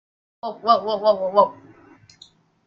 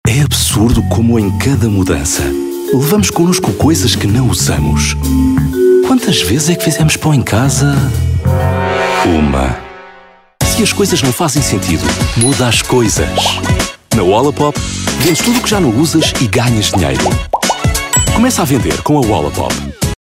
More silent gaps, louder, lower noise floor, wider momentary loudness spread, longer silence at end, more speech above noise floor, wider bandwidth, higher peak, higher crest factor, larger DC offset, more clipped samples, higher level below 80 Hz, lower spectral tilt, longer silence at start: neither; second, -20 LUFS vs -12 LUFS; first, -53 dBFS vs -40 dBFS; first, 13 LU vs 4 LU; first, 1.15 s vs 0.1 s; first, 34 dB vs 29 dB; second, 7.2 kHz vs 16.5 kHz; about the same, -2 dBFS vs 0 dBFS; first, 20 dB vs 10 dB; neither; neither; second, -70 dBFS vs -24 dBFS; first, -6 dB/octave vs -4.5 dB/octave; first, 0.45 s vs 0.05 s